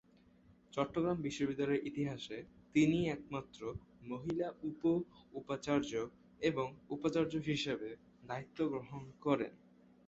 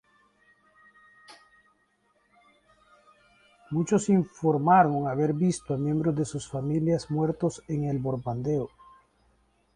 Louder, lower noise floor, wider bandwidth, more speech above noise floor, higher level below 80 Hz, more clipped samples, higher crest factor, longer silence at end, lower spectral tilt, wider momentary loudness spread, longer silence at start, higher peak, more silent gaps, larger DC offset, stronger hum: second, -38 LUFS vs -27 LUFS; about the same, -66 dBFS vs -69 dBFS; second, 8 kHz vs 10.5 kHz; second, 28 dB vs 44 dB; second, -66 dBFS vs -60 dBFS; neither; about the same, 20 dB vs 22 dB; second, 0.5 s vs 1.1 s; second, -5.5 dB/octave vs -7 dB/octave; about the same, 12 LU vs 10 LU; second, 0.75 s vs 1.3 s; second, -18 dBFS vs -6 dBFS; neither; neither; neither